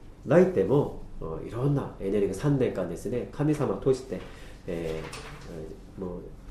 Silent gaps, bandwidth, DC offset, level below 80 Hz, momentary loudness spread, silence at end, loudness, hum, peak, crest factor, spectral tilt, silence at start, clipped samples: none; 13 kHz; under 0.1%; -46 dBFS; 18 LU; 0 s; -28 LUFS; none; -8 dBFS; 20 dB; -8 dB/octave; 0 s; under 0.1%